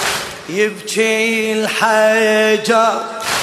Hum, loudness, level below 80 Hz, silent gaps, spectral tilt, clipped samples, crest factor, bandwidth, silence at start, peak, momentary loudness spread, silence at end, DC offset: none; -15 LUFS; -56 dBFS; none; -2.5 dB/octave; under 0.1%; 14 dB; 13.5 kHz; 0 s; -2 dBFS; 7 LU; 0 s; under 0.1%